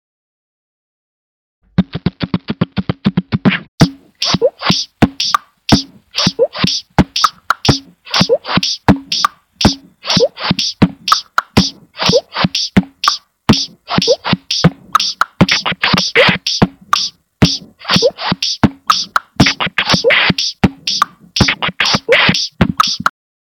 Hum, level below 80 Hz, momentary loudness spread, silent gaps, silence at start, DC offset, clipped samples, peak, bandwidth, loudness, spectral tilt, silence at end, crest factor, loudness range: none; -34 dBFS; 7 LU; 3.68-3.78 s; 1.8 s; under 0.1%; 0.4%; 0 dBFS; 18.5 kHz; -14 LUFS; -4 dB/octave; 0.45 s; 14 dB; 3 LU